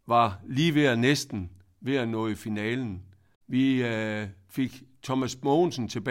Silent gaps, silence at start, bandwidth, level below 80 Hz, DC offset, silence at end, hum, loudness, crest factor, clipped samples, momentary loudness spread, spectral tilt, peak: 3.36-3.41 s; 0.05 s; 16 kHz; -62 dBFS; under 0.1%; 0 s; none; -27 LUFS; 18 dB; under 0.1%; 14 LU; -5.5 dB/octave; -10 dBFS